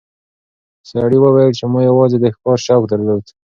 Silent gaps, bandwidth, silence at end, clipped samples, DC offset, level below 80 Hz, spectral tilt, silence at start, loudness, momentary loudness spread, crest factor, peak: none; 7.2 kHz; 0.3 s; under 0.1%; under 0.1%; -52 dBFS; -7.5 dB/octave; 0.9 s; -13 LUFS; 8 LU; 14 dB; 0 dBFS